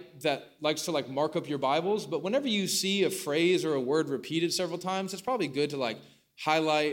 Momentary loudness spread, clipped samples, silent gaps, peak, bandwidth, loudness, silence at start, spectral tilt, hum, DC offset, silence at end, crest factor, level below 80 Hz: 7 LU; under 0.1%; none; -10 dBFS; 17 kHz; -29 LUFS; 0 s; -4 dB/octave; none; under 0.1%; 0 s; 18 dB; -78 dBFS